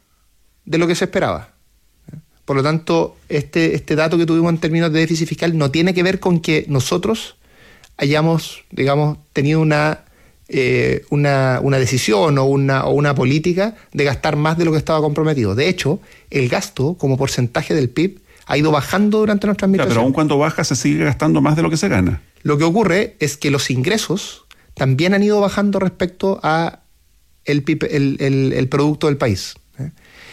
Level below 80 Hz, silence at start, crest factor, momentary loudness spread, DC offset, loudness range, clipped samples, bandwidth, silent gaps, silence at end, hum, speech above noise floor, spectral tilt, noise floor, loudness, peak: -46 dBFS; 0.65 s; 12 dB; 7 LU; under 0.1%; 3 LU; under 0.1%; 15 kHz; none; 0 s; none; 40 dB; -6 dB/octave; -56 dBFS; -17 LUFS; -4 dBFS